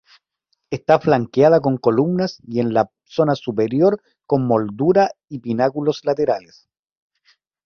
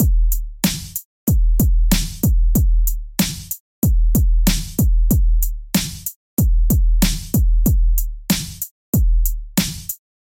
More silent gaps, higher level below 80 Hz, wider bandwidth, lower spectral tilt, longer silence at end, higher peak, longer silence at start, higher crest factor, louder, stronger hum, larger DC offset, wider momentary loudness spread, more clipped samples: second, none vs 1.05-1.27 s, 3.60-3.82 s, 6.16-6.37 s, 8.71-8.93 s; second, -58 dBFS vs -18 dBFS; second, 6.8 kHz vs 17 kHz; first, -8 dB/octave vs -5 dB/octave; first, 1.25 s vs 0.25 s; about the same, 0 dBFS vs 0 dBFS; first, 0.7 s vs 0 s; about the same, 18 dB vs 16 dB; about the same, -19 LUFS vs -20 LUFS; neither; neither; about the same, 9 LU vs 7 LU; neither